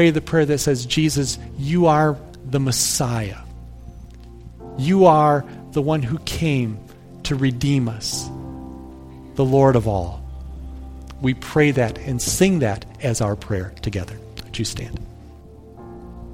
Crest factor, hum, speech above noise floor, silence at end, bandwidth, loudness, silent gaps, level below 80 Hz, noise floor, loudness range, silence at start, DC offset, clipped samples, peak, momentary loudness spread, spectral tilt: 20 dB; none; 23 dB; 0 s; 16.5 kHz; -20 LUFS; none; -38 dBFS; -42 dBFS; 4 LU; 0 s; under 0.1%; under 0.1%; 0 dBFS; 22 LU; -5 dB/octave